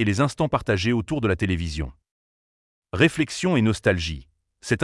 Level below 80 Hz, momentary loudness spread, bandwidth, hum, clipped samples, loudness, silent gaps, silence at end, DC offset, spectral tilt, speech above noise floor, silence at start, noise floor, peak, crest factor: -44 dBFS; 13 LU; 12 kHz; none; under 0.1%; -23 LUFS; 2.11-2.82 s; 0 s; under 0.1%; -5.5 dB/octave; over 68 dB; 0 s; under -90 dBFS; -4 dBFS; 20 dB